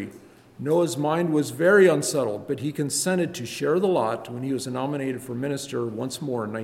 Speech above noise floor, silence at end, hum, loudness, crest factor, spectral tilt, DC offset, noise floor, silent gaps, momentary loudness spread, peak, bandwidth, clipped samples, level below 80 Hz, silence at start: 25 dB; 0 s; none; -24 LUFS; 18 dB; -5 dB/octave; under 0.1%; -48 dBFS; none; 11 LU; -6 dBFS; 16.5 kHz; under 0.1%; -66 dBFS; 0 s